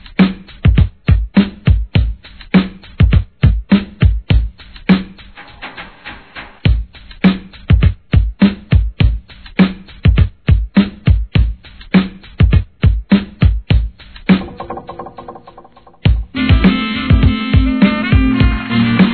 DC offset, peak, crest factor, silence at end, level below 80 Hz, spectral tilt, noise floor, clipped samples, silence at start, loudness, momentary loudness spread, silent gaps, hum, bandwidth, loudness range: 0.4%; 0 dBFS; 14 dB; 0 s; -18 dBFS; -10.5 dB/octave; -42 dBFS; 0.1%; 0.05 s; -14 LUFS; 17 LU; none; none; 4.5 kHz; 4 LU